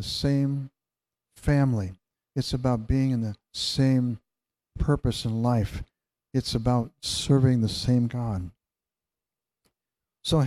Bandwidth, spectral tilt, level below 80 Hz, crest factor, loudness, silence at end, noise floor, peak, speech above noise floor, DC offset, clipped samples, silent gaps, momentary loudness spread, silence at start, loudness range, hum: 13.5 kHz; -6.5 dB/octave; -42 dBFS; 18 dB; -26 LUFS; 0 s; under -90 dBFS; -8 dBFS; over 65 dB; under 0.1%; under 0.1%; none; 11 LU; 0 s; 2 LU; none